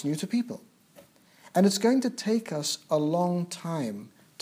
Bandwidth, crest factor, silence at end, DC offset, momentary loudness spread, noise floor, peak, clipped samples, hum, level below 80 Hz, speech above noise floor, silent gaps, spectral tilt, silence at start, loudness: 16 kHz; 18 dB; 0.35 s; under 0.1%; 11 LU; -57 dBFS; -10 dBFS; under 0.1%; none; -82 dBFS; 30 dB; none; -5 dB/octave; 0 s; -28 LUFS